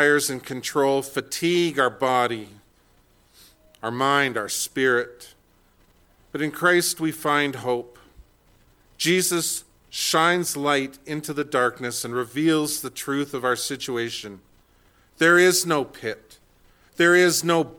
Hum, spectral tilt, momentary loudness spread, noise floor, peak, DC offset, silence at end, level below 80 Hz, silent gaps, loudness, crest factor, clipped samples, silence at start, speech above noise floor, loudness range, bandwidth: none; -3 dB/octave; 13 LU; -59 dBFS; -4 dBFS; under 0.1%; 0 s; -62 dBFS; none; -22 LUFS; 20 dB; under 0.1%; 0 s; 37 dB; 3 LU; 19 kHz